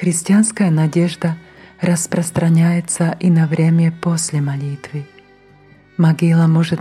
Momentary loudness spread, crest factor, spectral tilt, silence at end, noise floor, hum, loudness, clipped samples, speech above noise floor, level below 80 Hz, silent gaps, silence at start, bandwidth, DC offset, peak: 11 LU; 12 dB; -6 dB/octave; 0 s; -47 dBFS; none; -16 LUFS; under 0.1%; 32 dB; -56 dBFS; none; 0 s; 13 kHz; under 0.1%; -4 dBFS